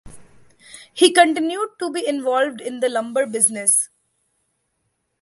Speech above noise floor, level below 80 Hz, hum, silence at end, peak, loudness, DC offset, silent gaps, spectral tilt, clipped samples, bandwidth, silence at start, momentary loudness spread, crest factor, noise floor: 53 dB; -60 dBFS; none; 1.35 s; 0 dBFS; -18 LUFS; under 0.1%; none; -1 dB/octave; under 0.1%; 12 kHz; 0.05 s; 11 LU; 20 dB; -72 dBFS